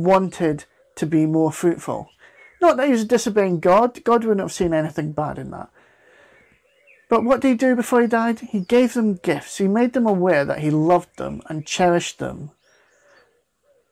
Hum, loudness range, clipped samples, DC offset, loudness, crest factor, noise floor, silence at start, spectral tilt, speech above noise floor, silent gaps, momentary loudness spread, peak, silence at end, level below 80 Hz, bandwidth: none; 4 LU; under 0.1%; under 0.1%; -20 LUFS; 14 dB; -63 dBFS; 0 s; -6 dB/octave; 44 dB; none; 14 LU; -6 dBFS; 1.45 s; -54 dBFS; 15 kHz